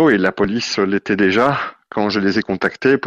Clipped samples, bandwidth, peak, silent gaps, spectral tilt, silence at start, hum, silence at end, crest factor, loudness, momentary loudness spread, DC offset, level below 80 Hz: under 0.1%; 8 kHz; -2 dBFS; none; -5.5 dB/octave; 0 s; none; 0 s; 14 dB; -17 LUFS; 7 LU; under 0.1%; -50 dBFS